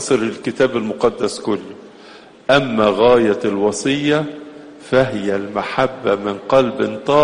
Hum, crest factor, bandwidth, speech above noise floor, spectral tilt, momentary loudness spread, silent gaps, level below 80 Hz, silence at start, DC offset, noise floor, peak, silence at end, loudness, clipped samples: none; 16 dB; 10 kHz; 25 dB; -5 dB/octave; 11 LU; none; -50 dBFS; 0 s; under 0.1%; -41 dBFS; 0 dBFS; 0 s; -17 LUFS; under 0.1%